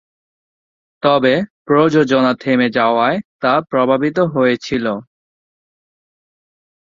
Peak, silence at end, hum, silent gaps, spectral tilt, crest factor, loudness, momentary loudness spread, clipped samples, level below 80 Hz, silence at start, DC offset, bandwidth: 0 dBFS; 1.85 s; none; 1.50-1.65 s, 3.25-3.40 s; -6.5 dB/octave; 16 dB; -15 LUFS; 6 LU; under 0.1%; -56 dBFS; 1.05 s; under 0.1%; 7.4 kHz